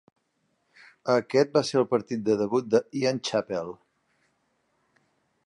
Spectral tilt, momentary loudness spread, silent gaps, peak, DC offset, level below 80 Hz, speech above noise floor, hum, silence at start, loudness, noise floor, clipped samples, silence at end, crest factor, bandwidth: -5.5 dB/octave; 10 LU; none; -8 dBFS; under 0.1%; -72 dBFS; 49 dB; none; 1.05 s; -26 LUFS; -74 dBFS; under 0.1%; 1.7 s; 20 dB; 11 kHz